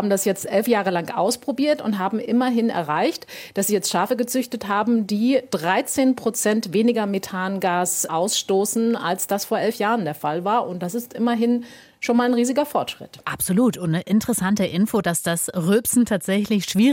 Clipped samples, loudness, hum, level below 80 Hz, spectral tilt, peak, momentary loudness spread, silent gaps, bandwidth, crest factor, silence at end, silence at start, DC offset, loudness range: under 0.1%; -21 LUFS; none; -60 dBFS; -4.5 dB/octave; -6 dBFS; 6 LU; none; 17 kHz; 16 dB; 0 s; 0 s; under 0.1%; 2 LU